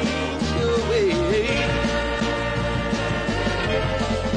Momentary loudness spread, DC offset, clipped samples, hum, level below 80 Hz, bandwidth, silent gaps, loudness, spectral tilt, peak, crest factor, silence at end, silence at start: 3 LU; under 0.1%; under 0.1%; none; -34 dBFS; 10.5 kHz; none; -22 LUFS; -5.5 dB/octave; -10 dBFS; 12 dB; 0 s; 0 s